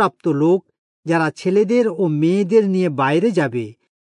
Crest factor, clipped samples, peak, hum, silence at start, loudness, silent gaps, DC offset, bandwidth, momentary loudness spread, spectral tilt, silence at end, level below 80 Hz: 14 dB; under 0.1%; -4 dBFS; none; 0 s; -18 LUFS; 0.78-1.03 s; under 0.1%; 10.5 kHz; 6 LU; -7.5 dB/octave; 0.4 s; -72 dBFS